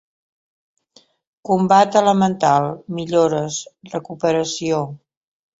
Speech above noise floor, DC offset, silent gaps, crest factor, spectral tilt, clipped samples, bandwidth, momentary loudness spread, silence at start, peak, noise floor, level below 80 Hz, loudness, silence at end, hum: 37 dB; under 0.1%; none; 18 dB; -5.5 dB/octave; under 0.1%; 8 kHz; 16 LU; 1.45 s; -2 dBFS; -55 dBFS; -60 dBFS; -18 LUFS; 0.65 s; none